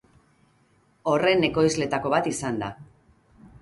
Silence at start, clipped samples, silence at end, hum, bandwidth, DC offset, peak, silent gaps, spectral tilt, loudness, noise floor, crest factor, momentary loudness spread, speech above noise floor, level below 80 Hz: 1.05 s; under 0.1%; 0.75 s; none; 11.5 kHz; under 0.1%; -8 dBFS; none; -4.5 dB/octave; -24 LUFS; -63 dBFS; 18 dB; 11 LU; 39 dB; -56 dBFS